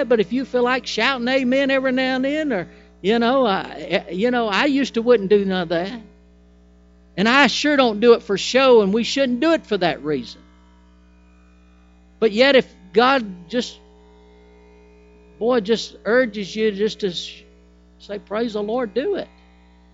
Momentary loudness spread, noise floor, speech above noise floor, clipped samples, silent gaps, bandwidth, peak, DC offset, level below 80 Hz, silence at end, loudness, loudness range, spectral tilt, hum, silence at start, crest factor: 12 LU; -50 dBFS; 32 dB; under 0.1%; none; 8 kHz; 0 dBFS; under 0.1%; -52 dBFS; 0.7 s; -19 LUFS; 7 LU; -4.5 dB/octave; 60 Hz at -45 dBFS; 0 s; 20 dB